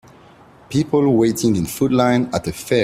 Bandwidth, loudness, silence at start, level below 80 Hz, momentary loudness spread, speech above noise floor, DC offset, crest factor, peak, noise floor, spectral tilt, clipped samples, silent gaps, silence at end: 16 kHz; -18 LUFS; 0.7 s; -48 dBFS; 7 LU; 29 dB; under 0.1%; 16 dB; -2 dBFS; -46 dBFS; -6 dB/octave; under 0.1%; none; 0 s